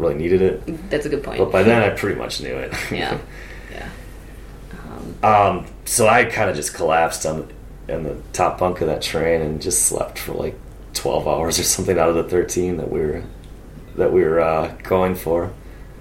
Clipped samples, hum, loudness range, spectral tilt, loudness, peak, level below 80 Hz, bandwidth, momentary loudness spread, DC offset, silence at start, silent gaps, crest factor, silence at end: under 0.1%; none; 4 LU; -4 dB/octave; -19 LUFS; -2 dBFS; -38 dBFS; 16.5 kHz; 20 LU; under 0.1%; 0 s; none; 18 dB; 0 s